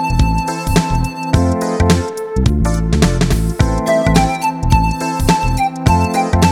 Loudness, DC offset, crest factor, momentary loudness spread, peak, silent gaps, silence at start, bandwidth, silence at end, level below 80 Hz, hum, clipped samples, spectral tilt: -15 LUFS; under 0.1%; 14 dB; 4 LU; 0 dBFS; none; 0 s; 17 kHz; 0 s; -20 dBFS; none; under 0.1%; -6 dB/octave